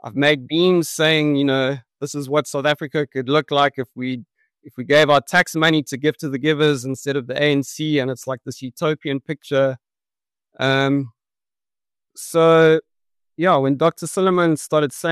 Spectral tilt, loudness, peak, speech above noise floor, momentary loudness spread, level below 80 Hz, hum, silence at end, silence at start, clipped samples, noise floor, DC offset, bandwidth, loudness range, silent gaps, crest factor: -5 dB/octave; -19 LUFS; -4 dBFS; over 72 dB; 12 LU; -64 dBFS; none; 0 s; 0.05 s; under 0.1%; under -90 dBFS; under 0.1%; 13 kHz; 5 LU; none; 16 dB